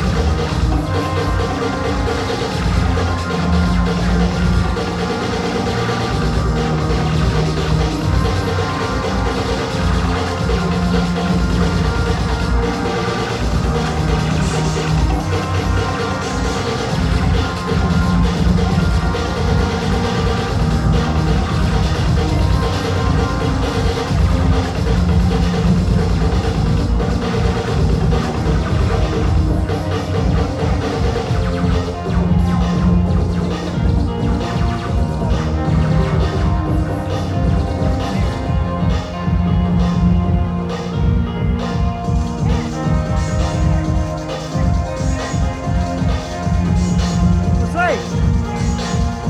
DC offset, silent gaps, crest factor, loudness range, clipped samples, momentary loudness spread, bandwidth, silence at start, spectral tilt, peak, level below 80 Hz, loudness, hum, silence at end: under 0.1%; none; 14 dB; 2 LU; under 0.1%; 4 LU; 12 kHz; 0 s; -6.5 dB/octave; -2 dBFS; -22 dBFS; -18 LUFS; none; 0 s